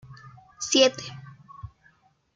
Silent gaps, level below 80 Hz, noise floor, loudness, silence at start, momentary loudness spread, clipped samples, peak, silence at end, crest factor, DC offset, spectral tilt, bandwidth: none; -60 dBFS; -62 dBFS; -22 LUFS; 0.1 s; 25 LU; under 0.1%; -4 dBFS; 0.7 s; 24 dB; under 0.1%; -2.5 dB/octave; 9.4 kHz